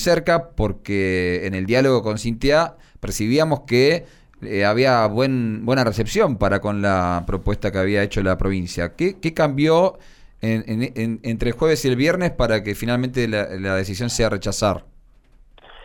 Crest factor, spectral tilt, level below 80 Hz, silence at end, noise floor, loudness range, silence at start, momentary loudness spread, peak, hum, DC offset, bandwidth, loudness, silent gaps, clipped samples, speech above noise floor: 14 dB; -5.5 dB/octave; -36 dBFS; 0 s; -50 dBFS; 2 LU; 0 s; 8 LU; -6 dBFS; none; under 0.1%; 19 kHz; -20 LUFS; none; under 0.1%; 31 dB